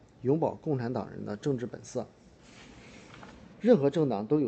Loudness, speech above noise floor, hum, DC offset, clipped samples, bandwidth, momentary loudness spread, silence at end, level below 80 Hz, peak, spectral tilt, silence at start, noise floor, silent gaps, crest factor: -30 LUFS; 25 dB; none; under 0.1%; under 0.1%; 8.6 kHz; 26 LU; 0 s; -64 dBFS; -10 dBFS; -8 dB/octave; 0.2 s; -54 dBFS; none; 20 dB